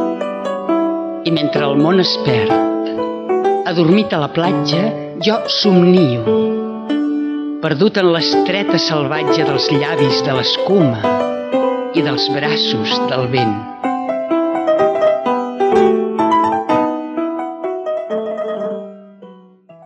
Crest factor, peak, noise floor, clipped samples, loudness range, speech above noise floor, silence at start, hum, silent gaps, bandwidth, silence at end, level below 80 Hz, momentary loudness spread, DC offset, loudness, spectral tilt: 14 dB; 0 dBFS; -43 dBFS; under 0.1%; 2 LU; 29 dB; 0 s; none; none; 8.2 kHz; 0.15 s; -58 dBFS; 9 LU; under 0.1%; -15 LUFS; -6 dB/octave